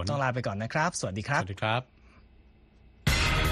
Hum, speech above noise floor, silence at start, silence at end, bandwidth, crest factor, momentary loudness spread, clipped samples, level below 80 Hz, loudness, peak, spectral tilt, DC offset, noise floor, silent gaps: none; 27 dB; 0 s; 0 s; 13.5 kHz; 18 dB; 7 LU; under 0.1%; -40 dBFS; -29 LUFS; -12 dBFS; -4.5 dB/octave; under 0.1%; -57 dBFS; none